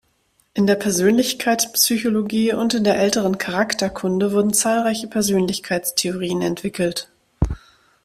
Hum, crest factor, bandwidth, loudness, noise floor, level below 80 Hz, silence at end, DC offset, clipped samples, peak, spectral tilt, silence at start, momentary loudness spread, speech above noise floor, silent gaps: none; 16 dB; 16 kHz; -19 LUFS; -63 dBFS; -40 dBFS; 0.45 s; under 0.1%; under 0.1%; -2 dBFS; -4 dB/octave; 0.55 s; 7 LU; 44 dB; none